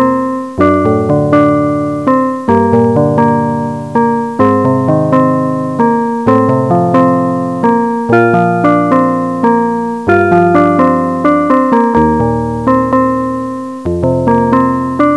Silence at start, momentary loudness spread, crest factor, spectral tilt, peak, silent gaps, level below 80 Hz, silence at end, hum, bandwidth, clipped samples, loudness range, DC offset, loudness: 0 s; 5 LU; 10 dB; -9 dB/octave; 0 dBFS; none; -38 dBFS; 0 s; none; 11 kHz; 0.6%; 2 LU; 0.4%; -11 LUFS